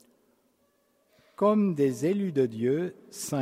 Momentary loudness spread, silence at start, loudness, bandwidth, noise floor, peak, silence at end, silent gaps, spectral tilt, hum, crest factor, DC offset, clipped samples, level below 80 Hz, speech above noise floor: 9 LU; 1.4 s; -27 LUFS; 16 kHz; -70 dBFS; -12 dBFS; 0 s; none; -6.5 dB/octave; none; 16 dB; under 0.1%; under 0.1%; -74 dBFS; 43 dB